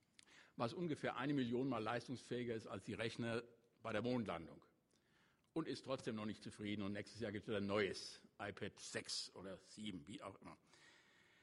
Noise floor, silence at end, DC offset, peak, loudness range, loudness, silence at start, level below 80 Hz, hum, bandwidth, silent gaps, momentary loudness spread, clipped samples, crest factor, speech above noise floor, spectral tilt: -78 dBFS; 0.45 s; under 0.1%; -26 dBFS; 4 LU; -46 LUFS; 0.3 s; -78 dBFS; none; 11.5 kHz; none; 14 LU; under 0.1%; 20 dB; 32 dB; -5 dB/octave